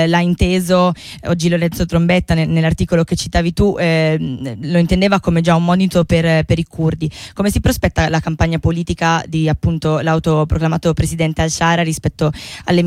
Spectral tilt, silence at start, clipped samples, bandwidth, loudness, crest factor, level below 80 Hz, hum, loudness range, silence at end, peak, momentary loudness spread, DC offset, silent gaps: -6 dB/octave; 0 s; under 0.1%; 15 kHz; -16 LUFS; 12 dB; -30 dBFS; none; 2 LU; 0 s; -2 dBFS; 5 LU; under 0.1%; none